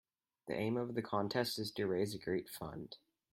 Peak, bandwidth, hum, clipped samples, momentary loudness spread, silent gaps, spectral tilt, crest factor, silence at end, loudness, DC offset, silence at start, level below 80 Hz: -20 dBFS; 16 kHz; none; under 0.1%; 14 LU; none; -5.5 dB/octave; 20 dB; 0.35 s; -39 LUFS; under 0.1%; 0.45 s; -72 dBFS